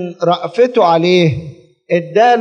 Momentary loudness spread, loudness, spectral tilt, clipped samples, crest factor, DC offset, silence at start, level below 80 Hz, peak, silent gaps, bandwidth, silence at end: 8 LU; -13 LUFS; -6.5 dB/octave; under 0.1%; 12 dB; under 0.1%; 0 s; -54 dBFS; 0 dBFS; none; 9 kHz; 0 s